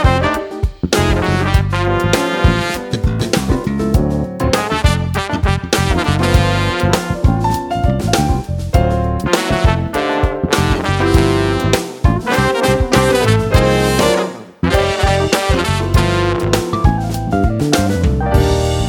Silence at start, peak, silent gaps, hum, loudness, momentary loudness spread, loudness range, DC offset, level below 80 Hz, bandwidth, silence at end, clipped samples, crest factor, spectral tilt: 0 s; 0 dBFS; none; none; -15 LUFS; 5 LU; 2 LU; under 0.1%; -22 dBFS; 19 kHz; 0 s; under 0.1%; 14 dB; -5.5 dB/octave